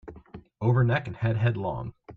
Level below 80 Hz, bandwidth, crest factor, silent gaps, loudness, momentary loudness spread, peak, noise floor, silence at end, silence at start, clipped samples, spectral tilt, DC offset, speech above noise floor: -52 dBFS; 4.3 kHz; 16 dB; none; -27 LUFS; 11 LU; -10 dBFS; -48 dBFS; 0 s; 0.05 s; under 0.1%; -9.5 dB/octave; under 0.1%; 23 dB